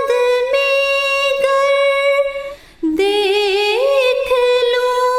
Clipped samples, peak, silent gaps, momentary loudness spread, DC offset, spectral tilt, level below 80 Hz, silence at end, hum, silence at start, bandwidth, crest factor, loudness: under 0.1%; -4 dBFS; none; 5 LU; under 0.1%; -1.5 dB/octave; -50 dBFS; 0 s; none; 0 s; 14.5 kHz; 12 dB; -15 LUFS